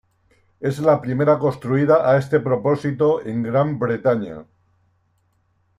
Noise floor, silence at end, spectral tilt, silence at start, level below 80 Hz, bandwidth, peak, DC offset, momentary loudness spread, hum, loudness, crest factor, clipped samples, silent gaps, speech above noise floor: -65 dBFS; 1.35 s; -8.5 dB/octave; 0.6 s; -60 dBFS; 12 kHz; -4 dBFS; under 0.1%; 9 LU; none; -19 LUFS; 16 dB; under 0.1%; none; 46 dB